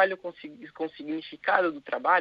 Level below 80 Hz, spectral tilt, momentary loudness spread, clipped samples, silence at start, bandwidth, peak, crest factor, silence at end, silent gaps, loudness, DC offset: -76 dBFS; -6.5 dB/octave; 16 LU; under 0.1%; 0 s; 5.4 kHz; -8 dBFS; 20 dB; 0 s; none; -29 LUFS; under 0.1%